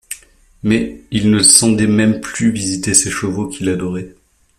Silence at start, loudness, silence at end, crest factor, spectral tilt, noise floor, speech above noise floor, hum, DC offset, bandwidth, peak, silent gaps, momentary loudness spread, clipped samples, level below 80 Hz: 0.1 s; -14 LUFS; 0.5 s; 16 dB; -3.5 dB/octave; -44 dBFS; 30 dB; none; under 0.1%; 16 kHz; 0 dBFS; none; 16 LU; under 0.1%; -44 dBFS